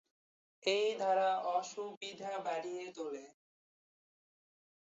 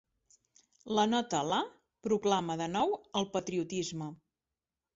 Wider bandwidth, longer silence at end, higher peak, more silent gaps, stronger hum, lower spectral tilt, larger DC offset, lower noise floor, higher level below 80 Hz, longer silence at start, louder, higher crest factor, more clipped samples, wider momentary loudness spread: about the same, 8 kHz vs 8 kHz; first, 1.55 s vs 0.8 s; second, -20 dBFS vs -14 dBFS; first, 1.97-2.01 s vs none; neither; second, -1 dB/octave vs -4.5 dB/octave; neither; about the same, under -90 dBFS vs under -90 dBFS; second, under -90 dBFS vs -70 dBFS; second, 0.65 s vs 0.85 s; second, -37 LUFS vs -33 LUFS; about the same, 20 dB vs 20 dB; neither; about the same, 12 LU vs 11 LU